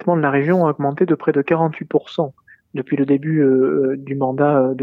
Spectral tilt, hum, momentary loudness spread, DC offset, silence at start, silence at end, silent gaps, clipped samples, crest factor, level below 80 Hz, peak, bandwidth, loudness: -10 dB/octave; none; 8 LU; under 0.1%; 0 s; 0 s; none; under 0.1%; 14 dB; -66 dBFS; -4 dBFS; 4.7 kHz; -18 LUFS